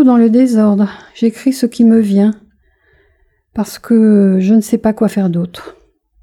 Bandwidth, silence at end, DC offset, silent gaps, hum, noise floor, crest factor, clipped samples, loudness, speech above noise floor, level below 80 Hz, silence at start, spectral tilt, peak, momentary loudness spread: 13.5 kHz; 0.5 s; under 0.1%; none; none; -56 dBFS; 12 dB; under 0.1%; -12 LUFS; 45 dB; -52 dBFS; 0 s; -7.5 dB/octave; 0 dBFS; 13 LU